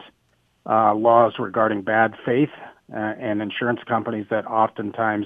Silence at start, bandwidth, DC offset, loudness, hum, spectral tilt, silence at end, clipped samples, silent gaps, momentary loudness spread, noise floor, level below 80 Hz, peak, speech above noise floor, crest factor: 0 s; 3.8 kHz; under 0.1%; -21 LUFS; none; -8.5 dB/octave; 0 s; under 0.1%; none; 10 LU; -65 dBFS; -66 dBFS; -2 dBFS; 44 dB; 20 dB